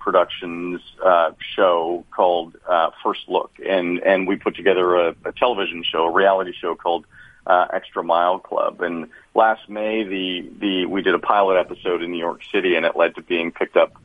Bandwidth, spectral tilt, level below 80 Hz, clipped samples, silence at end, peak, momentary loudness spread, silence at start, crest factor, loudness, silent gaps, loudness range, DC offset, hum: 4.9 kHz; -6.5 dB/octave; -58 dBFS; under 0.1%; 0.15 s; 0 dBFS; 9 LU; 0 s; 20 dB; -20 LUFS; none; 2 LU; under 0.1%; none